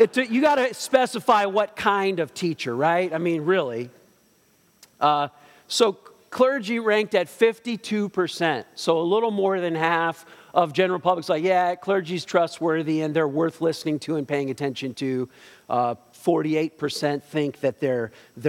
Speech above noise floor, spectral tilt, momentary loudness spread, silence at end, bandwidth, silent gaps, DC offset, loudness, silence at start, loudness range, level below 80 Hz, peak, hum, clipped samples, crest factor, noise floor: 38 dB; -5 dB/octave; 7 LU; 0 s; 16.5 kHz; none; under 0.1%; -23 LUFS; 0 s; 4 LU; -72 dBFS; -4 dBFS; none; under 0.1%; 20 dB; -61 dBFS